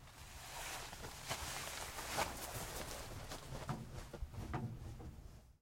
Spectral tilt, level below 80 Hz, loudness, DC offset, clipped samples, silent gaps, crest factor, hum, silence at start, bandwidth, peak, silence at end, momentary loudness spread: -3 dB/octave; -56 dBFS; -46 LUFS; under 0.1%; under 0.1%; none; 22 dB; none; 0 s; 16.5 kHz; -24 dBFS; 0.05 s; 11 LU